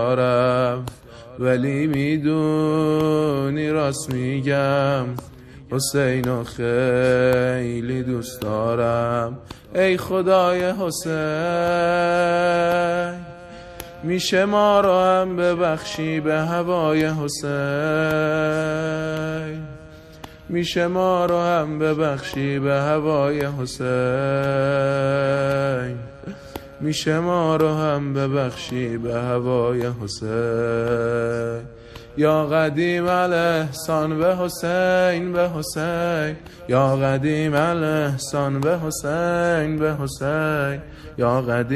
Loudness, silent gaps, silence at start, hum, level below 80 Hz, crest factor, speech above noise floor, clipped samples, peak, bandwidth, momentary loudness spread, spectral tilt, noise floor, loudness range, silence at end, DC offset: -21 LUFS; none; 0 s; none; -48 dBFS; 18 dB; 21 dB; under 0.1%; -4 dBFS; 14.5 kHz; 10 LU; -6 dB/octave; -41 dBFS; 3 LU; 0 s; under 0.1%